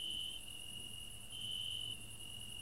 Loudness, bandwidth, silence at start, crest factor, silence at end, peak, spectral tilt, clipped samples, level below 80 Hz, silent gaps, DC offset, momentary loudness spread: -44 LUFS; 16 kHz; 0 s; 14 dB; 0 s; -32 dBFS; -1 dB/octave; under 0.1%; -62 dBFS; none; 0.2%; 7 LU